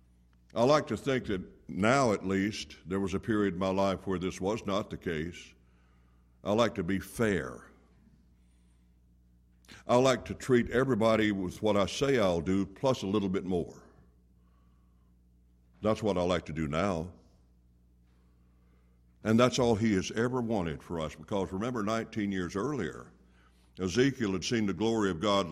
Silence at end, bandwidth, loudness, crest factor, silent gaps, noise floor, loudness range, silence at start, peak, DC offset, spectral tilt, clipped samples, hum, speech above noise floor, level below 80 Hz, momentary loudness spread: 0 s; 14.5 kHz; -30 LUFS; 20 dB; none; -63 dBFS; 7 LU; 0.55 s; -12 dBFS; under 0.1%; -5.5 dB/octave; under 0.1%; 60 Hz at -60 dBFS; 33 dB; -58 dBFS; 11 LU